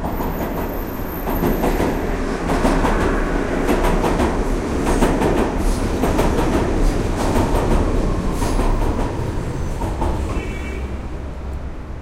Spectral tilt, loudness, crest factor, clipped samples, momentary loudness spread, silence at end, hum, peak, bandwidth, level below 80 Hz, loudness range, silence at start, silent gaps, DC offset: -6.5 dB/octave; -21 LUFS; 18 dB; under 0.1%; 9 LU; 0 s; none; -2 dBFS; 15 kHz; -22 dBFS; 4 LU; 0 s; none; under 0.1%